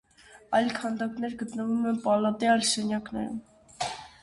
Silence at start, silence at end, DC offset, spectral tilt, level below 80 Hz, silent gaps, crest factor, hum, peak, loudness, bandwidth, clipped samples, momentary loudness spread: 0.3 s; 0.15 s; under 0.1%; -3.5 dB/octave; -64 dBFS; none; 18 dB; none; -10 dBFS; -28 LUFS; 11.5 kHz; under 0.1%; 11 LU